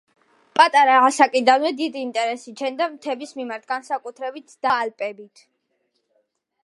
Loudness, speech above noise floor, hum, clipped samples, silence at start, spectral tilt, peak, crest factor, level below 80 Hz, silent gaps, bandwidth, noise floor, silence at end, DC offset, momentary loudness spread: -20 LUFS; 51 dB; none; under 0.1%; 0.55 s; -2 dB/octave; 0 dBFS; 20 dB; -74 dBFS; none; 11.5 kHz; -72 dBFS; 1.4 s; under 0.1%; 16 LU